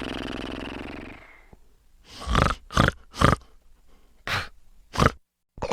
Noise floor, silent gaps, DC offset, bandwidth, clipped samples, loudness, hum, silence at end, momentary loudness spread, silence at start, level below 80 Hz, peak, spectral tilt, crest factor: -54 dBFS; none; under 0.1%; 16 kHz; under 0.1%; -26 LUFS; none; 0 s; 18 LU; 0 s; -36 dBFS; 0 dBFS; -5 dB/octave; 26 dB